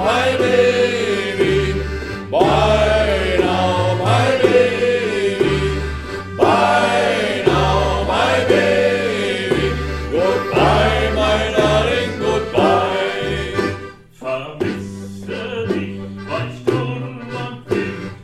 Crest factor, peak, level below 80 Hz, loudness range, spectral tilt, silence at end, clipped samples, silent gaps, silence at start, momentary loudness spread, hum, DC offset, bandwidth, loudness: 16 dB; 0 dBFS; -32 dBFS; 8 LU; -5.5 dB/octave; 0 s; under 0.1%; none; 0 s; 12 LU; none; under 0.1%; 14 kHz; -17 LUFS